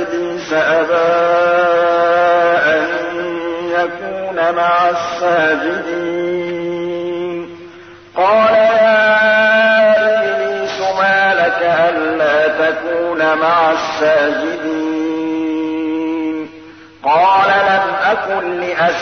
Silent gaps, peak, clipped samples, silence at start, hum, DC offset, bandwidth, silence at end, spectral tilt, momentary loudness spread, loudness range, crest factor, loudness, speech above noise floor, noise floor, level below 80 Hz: none; -2 dBFS; under 0.1%; 0 s; none; 0.1%; 6.6 kHz; 0 s; -4.5 dB/octave; 10 LU; 5 LU; 12 dB; -14 LUFS; 23 dB; -37 dBFS; -58 dBFS